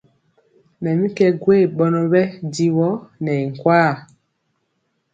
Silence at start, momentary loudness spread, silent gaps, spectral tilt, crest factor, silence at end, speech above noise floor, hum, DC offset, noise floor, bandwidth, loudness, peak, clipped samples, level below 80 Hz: 0.8 s; 8 LU; none; -7.5 dB/octave; 18 dB; 1.1 s; 53 dB; none; under 0.1%; -70 dBFS; 8.8 kHz; -18 LUFS; 0 dBFS; under 0.1%; -62 dBFS